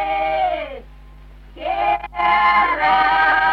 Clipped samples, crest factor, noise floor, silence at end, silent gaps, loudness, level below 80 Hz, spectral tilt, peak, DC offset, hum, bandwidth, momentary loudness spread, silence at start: under 0.1%; 14 dB; -41 dBFS; 0 s; none; -17 LUFS; -42 dBFS; -4.5 dB/octave; -4 dBFS; under 0.1%; none; 6.2 kHz; 14 LU; 0 s